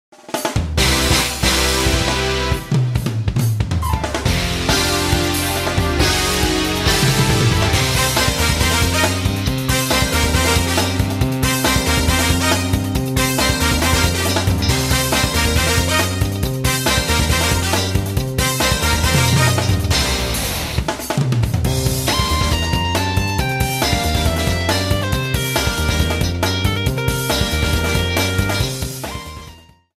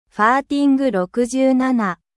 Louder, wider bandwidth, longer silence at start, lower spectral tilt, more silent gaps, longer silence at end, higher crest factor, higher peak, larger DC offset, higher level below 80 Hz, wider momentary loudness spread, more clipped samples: about the same, -17 LUFS vs -17 LUFS; first, 16 kHz vs 12 kHz; first, 0.3 s vs 0.15 s; second, -4 dB/octave vs -5.5 dB/octave; neither; first, 0.4 s vs 0.25 s; about the same, 16 dB vs 16 dB; about the same, -2 dBFS vs -2 dBFS; neither; first, -26 dBFS vs -58 dBFS; about the same, 5 LU vs 4 LU; neither